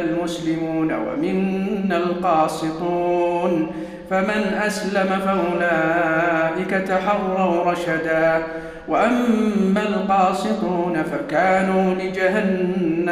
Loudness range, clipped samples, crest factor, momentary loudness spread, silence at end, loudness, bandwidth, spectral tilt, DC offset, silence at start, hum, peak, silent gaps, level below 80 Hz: 2 LU; under 0.1%; 14 dB; 5 LU; 0 s; -20 LUFS; 14.5 kHz; -6.5 dB/octave; under 0.1%; 0 s; none; -6 dBFS; none; -50 dBFS